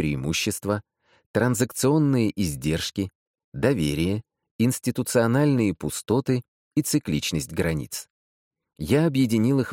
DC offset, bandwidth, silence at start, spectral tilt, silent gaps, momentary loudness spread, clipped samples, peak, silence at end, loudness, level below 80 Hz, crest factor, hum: under 0.1%; 17 kHz; 0 s; -5.5 dB/octave; 1.26-1.34 s, 3.15-3.34 s, 3.44-3.52 s, 4.51-4.59 s, 6.48-6.71 s, 8.10-8.51 s; 9 LU; under 0.1%; -8 dBFS; 0 s; -24 LUFS; -48 dBFS; 16 dB; none